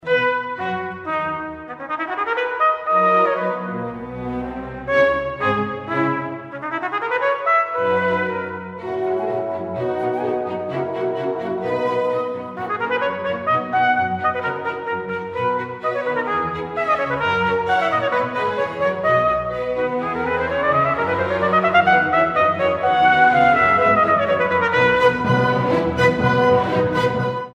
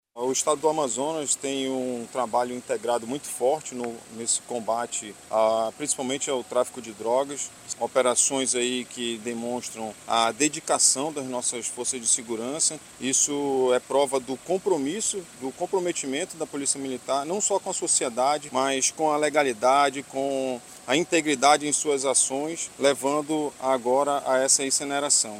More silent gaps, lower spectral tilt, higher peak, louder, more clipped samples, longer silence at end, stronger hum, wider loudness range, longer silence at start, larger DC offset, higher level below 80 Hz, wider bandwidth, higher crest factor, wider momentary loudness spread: neither; first, -6.5 dB/octave vs -2 dB/octave; about the same, -4 dBFS vs -4 dBFS; first, -19 LUFS vs -25 LUFS; neither; about the same, 0.05 s vs 0 s; neither; first, 7 LU vs 4 LU; about the same, 0.05 s vs 0.15 s; neither; first, -50 dBFS vs -68 dBFS; second, 9.4 kHz vs 16 kHz; about the same, 16 dB vs 20 dB; about the same, 11 LU vs 10 LU